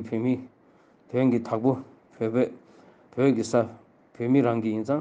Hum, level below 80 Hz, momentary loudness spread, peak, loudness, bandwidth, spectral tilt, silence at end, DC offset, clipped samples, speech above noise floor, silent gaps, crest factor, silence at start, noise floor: none; -72 dBFS; 10 LU; -10 dBFS; -26 LUFS; 9.2 kHz; -7.5 dB/octave; 0 s; under 0.1%; under 0.1%; 34 dB; none; 16 dB; 0 s; -58 dBFS